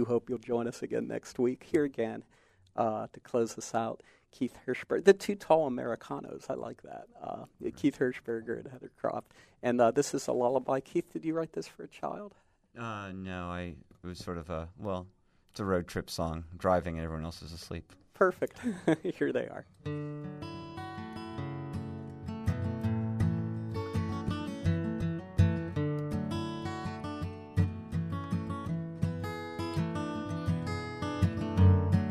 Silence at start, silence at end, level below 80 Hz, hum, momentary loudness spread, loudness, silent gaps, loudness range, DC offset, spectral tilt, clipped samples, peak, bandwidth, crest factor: 0 s; 0 s; -54 dBFS; none; 14 LU; -33 LUFS; none; 7 LU; under 0.1%; -7 dB/octave; under 0.1%; -10 dBFS; 13.5 kHz; 24 dB